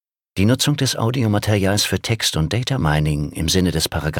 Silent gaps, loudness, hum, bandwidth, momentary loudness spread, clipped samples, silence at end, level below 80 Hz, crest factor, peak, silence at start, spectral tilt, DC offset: none; -19 LUFS; none; 18 kHz; 4 LU; under 0.1%; 0 s; -36 dBFS; 16 dB; -2 dBFS; 0.35 s; -4.5 dB/octave; under 0.1%